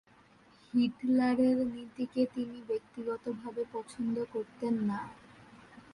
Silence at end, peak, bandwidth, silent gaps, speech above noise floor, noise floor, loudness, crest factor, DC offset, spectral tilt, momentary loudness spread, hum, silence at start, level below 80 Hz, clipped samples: 0.15 s; -18 dBFS; 11 kHz; none; 29 dB; -62 dBFS; -33 LUFS; 16 dB; under 0.1%; -7 dB/octave; 11 LU; none; 0.75 s; -70 dBFS; under 0.1%